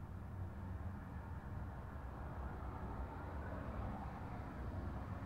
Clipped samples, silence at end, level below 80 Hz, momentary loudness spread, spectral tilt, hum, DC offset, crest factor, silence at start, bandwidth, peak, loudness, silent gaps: under 0.1%; 0 s; -52 dBFS; 3 LU; -8.5 dB/octave; none; under 0.1%; 12 dB; 0 s; 15.5 kHz; -34 dBFS; -48 LUFS; none